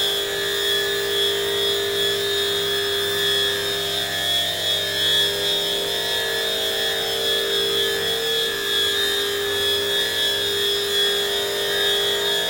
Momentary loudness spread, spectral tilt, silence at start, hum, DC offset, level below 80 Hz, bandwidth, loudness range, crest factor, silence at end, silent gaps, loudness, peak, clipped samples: 3 LU; -1 dB/octave; 0 s; none; under 0.1%; -56 dBFS; 16.5 kHz; 1 LU; 14 dB; 0 s; none; -19 LUFS; -8 dBFS; under 0.1%